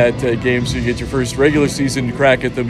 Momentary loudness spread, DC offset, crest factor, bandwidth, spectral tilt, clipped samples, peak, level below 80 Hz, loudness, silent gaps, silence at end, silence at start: 6 LU; under 0.1%; 16 dB; 13.5 kHz; -5.5 dB/octave; under 0.1%; 0 dBFS; -32 dBFS; -16 LUFS; none; 0 s; 0 s